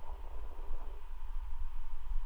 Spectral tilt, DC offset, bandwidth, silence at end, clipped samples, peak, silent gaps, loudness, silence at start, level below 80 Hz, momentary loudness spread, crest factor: -6.5 dB/octave; under 0.1%; 3.2 kHz; 0 s; under 0.1%; -22 dBFS; none; -48 LUFS; 0 s; -36 dBFS; 3 LU; 12 dB